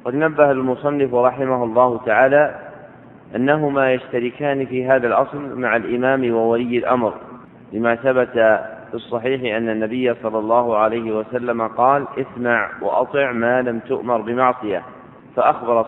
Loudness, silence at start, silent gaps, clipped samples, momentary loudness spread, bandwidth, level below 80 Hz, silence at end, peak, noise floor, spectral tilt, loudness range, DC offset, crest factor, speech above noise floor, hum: -18 LUFS; 0.05 s; none; under 0.1%; 8 LU; 4 kHz; -58 dBFS; 0 s; 0 dBFS; -42 dBFS; -8.5 dB/octave; 2 LU; under 0.1%; 18 dB; 24 dB; none